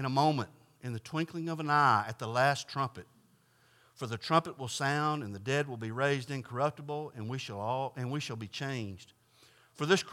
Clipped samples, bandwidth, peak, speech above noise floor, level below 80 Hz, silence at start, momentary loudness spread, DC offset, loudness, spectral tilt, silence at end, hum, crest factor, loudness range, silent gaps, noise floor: under 0.1%; 15.5 kHz; -12 dBFS; 34 dB; -78 dBFS; 0 s; 11 LU; under 0.1%; -33 LUFS; -5 dB/octave; 0 s; none; 22 dB; 6 LU; none; -67 dBFS